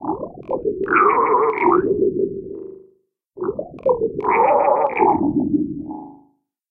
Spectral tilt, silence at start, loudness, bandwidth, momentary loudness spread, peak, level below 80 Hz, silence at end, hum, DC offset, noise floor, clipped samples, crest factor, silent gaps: -11 dB/octave; 0 s; -18 LUFS; 3.4 kHz; 16 LU; -2 dBFS; -52 dBFS; 0.55 s; 50 Hz at -60 dBFS; under 0.1%; -60 dBFS; under 0.1%; 16 dB; none